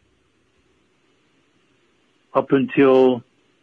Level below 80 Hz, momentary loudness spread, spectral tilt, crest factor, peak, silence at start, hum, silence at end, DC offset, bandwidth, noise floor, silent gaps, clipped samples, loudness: -68 dBFS; 10 LU; -8.5 dB/octave; 18 dB; -4 dBFS; 2.35 s; none; 0.4 s; under 0.1%; 4.8 kHz; -63 dBFS; none; under 0.1%; -18 LUFS